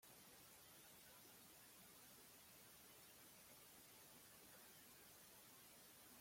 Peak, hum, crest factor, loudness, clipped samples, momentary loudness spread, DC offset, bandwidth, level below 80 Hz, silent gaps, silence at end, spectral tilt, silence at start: -52 dBFS; none; 14 dB; -63 LUFS; under 0.1%; 0 LU; under 0.1%; 16.5 kHz; -88 dBFS; none; 0 s; -1.5 dB/octave; 0 s